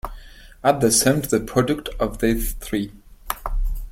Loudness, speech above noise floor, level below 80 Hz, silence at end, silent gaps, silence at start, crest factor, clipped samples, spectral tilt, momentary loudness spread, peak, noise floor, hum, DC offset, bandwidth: -21 LUFS; 21 dB; -30 dBFS; 0 s; none; 0.05 s; 20 dB; under 0.1%; -4 dB/octave; 14 LU; -2 dBFS; -42 dBFS; none; under 0.1%; 16.5 kHz